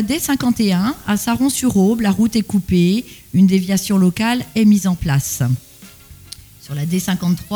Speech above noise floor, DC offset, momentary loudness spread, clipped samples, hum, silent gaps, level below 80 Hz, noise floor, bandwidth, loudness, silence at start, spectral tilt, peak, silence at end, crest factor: 25 dB; under 0.1%; 9 LU; under 0.1%; none; none; -42 dBFS; -41 dBFS; over 20 kHz; -17 LUFS; 0 s; -5.5 dB/octave; -4 dBFS; 0 s; 12 dB